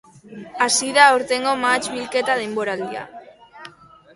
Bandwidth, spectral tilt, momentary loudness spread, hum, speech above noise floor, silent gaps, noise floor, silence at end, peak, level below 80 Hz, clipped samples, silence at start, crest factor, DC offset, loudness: 11.5 kHz; -1.5 dB/octave; 20 LU; none; 26 dB; none; -45 dBFS; 0.45 s; 0 dBFS; -64 dBFS; under 0.1%; 0.25 s; 22 dB; under 0.1%; -18 LUFS